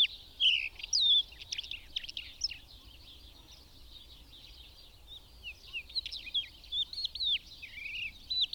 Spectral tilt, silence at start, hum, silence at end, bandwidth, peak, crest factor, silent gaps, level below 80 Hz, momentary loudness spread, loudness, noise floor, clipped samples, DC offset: 1 dB/octave; 0 s; none; 0 s; 19.5 kHz; -20 dBFS; 18 dB; none; -58 dBFS; 26 LU; -32 LUFS; -55 dBFS; under 0.1%; under 0.1%